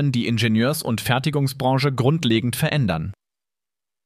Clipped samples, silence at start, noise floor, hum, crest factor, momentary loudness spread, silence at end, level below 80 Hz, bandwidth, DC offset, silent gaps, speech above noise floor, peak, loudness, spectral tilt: under 0.1%; 0 s; under -90 dBFS; none; 18 dB; 4 LU; 0.9 s; -50 dBFS; 15.5 kHz; under 0.1%; none; over 70 dB; -4 dBFS; -21 LUFS; -5.5 dB/octave